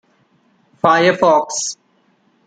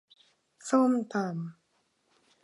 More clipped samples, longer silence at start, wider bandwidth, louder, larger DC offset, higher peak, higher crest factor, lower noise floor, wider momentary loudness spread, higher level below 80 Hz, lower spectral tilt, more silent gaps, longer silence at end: neither; first, 0.85 s vs 0.65 s; second, 9.6 kHz vs 11 kHz; first, -15 LUFS vs -29 LUFS; neither; first, -2 dBFS vs -14 dBFS; about the same, 16 dB vs 18 dB; second, -59 dBFS vs -73 dBFS; second, 12 LU vs 18 LU; first, -64 dBFS vs -86 dBFS; second, -3.5 dB/octave vs -6.5 dB/octave; neither; second, 0.75 s vs 0.9 s